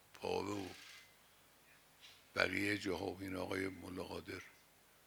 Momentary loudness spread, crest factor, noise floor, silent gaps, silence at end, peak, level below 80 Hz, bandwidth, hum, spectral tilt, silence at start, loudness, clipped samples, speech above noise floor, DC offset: 22 LU; 30 dB; -68 dBFS; none; 0.45 s; -14 dBFS; -78 dBFS; over 20 kHz; none; -4.5 dB/octave; 0.15 s; -42 LUFS; under 0.1%; 26 dB; under 0.1%